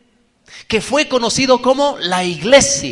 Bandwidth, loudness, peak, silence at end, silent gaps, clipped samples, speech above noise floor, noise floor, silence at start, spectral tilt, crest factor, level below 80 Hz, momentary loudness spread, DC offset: 11.5 kHz; -14 LUFS; 0 dBFS; 0 s; none; under 0.1%; 40 dB; -54 dBFS; 0.5 s; -2.5 dB/octave; 16 dB; -44 dBFS; 7 LU; under 0.1%